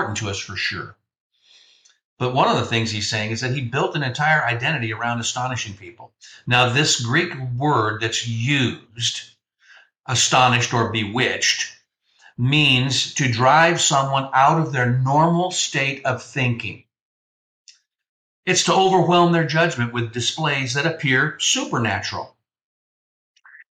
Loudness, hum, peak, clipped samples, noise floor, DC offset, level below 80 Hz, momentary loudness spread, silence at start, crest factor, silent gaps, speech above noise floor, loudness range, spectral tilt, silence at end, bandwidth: -19 LUFS; none; -4 dBFS; under 0.1%; -58 dBFS; under 0.1%; -58 dBFS; 10 LU; 0 s; 18 dB; 1.20-1.30 s, 2.04-2.17 s, 17.01-17.65 s, 18.09-18.43 s; 38 dB; 5 LU; -3.5 dB/octave; 1.45 s; 11 kHz